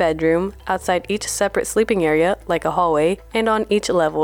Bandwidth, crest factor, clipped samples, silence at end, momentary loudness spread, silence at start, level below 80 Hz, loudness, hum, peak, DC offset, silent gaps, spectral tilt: 19 kHz; 12 dB; under 0.1%; 0 s; 4 LU; 0 s; -44 dBFS; -19 LUFS; none; -6 dBFS; under 0.1%; none; -4.5 dB/octave